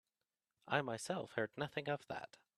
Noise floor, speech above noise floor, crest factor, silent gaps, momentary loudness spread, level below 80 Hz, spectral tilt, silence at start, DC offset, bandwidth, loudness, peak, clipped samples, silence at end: under -90 dBFS; over 48 dB; 26 dB; none; 7 LU; -80 dBFS; -4.5 dB/octave; 0.65 s; under 0.1%; 13.5 kHz; -42 LUFS; -18 dBFS; under 0.1%; 0.3 s